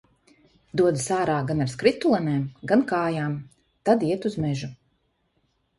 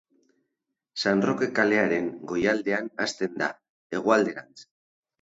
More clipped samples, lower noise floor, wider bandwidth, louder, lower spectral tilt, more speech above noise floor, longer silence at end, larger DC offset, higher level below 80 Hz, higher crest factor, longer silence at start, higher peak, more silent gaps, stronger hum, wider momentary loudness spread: neither; second, -70 dBFS vs -83 dBFS; first, 11.5 kHz vs 8 kHz; about the same, -24 LUFS vs -26 LUFS; about the same, -6 dB/octave vs -5 dB/octave; second, 47 dB vs 57 dB; first, 1.05 s vs 0.6 s; neither; first, -58 dBFS vs -66 dBFS; about the same, 20 dB vs 20 dB; second, 0.75 s vs 0.95 s; about the same, -6 dBFS vs -6 dBFS; second, none vs 3.69-3.90 s; neither; about the same, 9 LU vs 8 LU